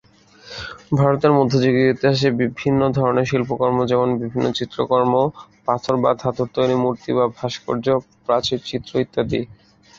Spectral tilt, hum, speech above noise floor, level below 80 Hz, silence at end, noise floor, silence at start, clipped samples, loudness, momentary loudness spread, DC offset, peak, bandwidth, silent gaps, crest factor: -7 dB/octave; none; 27 dB; -50 dBFS; 0.45 s; -45 dBFS; 0.45 s; under 0.1%; -19 LUFS; 8 LU; under 0.1%; -2 dBFS; 7.6 kHz; none; 18 dB